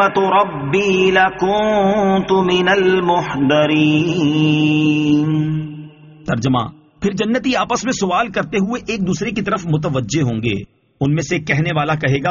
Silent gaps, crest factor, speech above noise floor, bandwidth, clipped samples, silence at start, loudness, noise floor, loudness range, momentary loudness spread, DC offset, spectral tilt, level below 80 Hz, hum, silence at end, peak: none; 14 dB; 21 dB; 7.4 kHz; under 0.1%; 0 s; -16 LUFS; -36 dBFS; 5 LU; 7 LU; under 0.1%; -5 dB/octave; -46 dBFS; none; 0 s; -2 dBFS